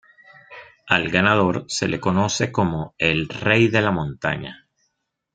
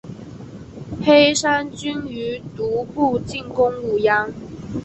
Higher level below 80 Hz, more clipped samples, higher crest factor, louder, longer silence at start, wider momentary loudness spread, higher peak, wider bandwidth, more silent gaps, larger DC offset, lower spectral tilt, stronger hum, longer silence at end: about the same, -52 dBFS vs -48 dBFS; neither; about the same, 22 dB vs 18 dB; about the same, -20 LUFS vs -19 LUFS; first, 0.5 s vs 0.05 s; second, 9 LU vs 23 LU; about the same, 0 dBFS vs -2 dBFS; about the same, 9.2 kHz vs 8.4 kHz; neither; neither; about the same, -5 dB/octave vs -4 dB/octave; neither; first, 0.8 s vs 0 s